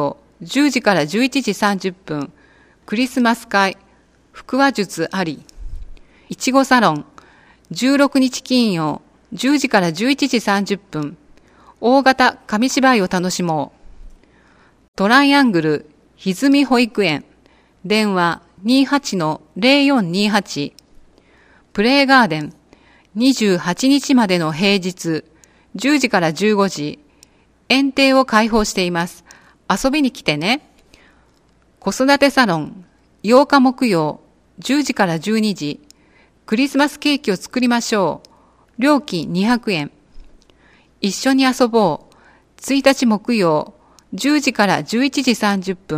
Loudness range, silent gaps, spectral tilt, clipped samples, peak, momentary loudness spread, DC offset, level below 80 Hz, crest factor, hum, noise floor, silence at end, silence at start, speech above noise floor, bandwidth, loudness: 4 LU; 14.88-14.93 s; -4.5 dB/octave; under 0.1%; 0 dBFS; 13 LU; under 0.1%; -46 dBFS; 18 dB; none; -55 dBFS; 0 s; 0 s; 39 dB; 15.5 kHz; -16 LUFS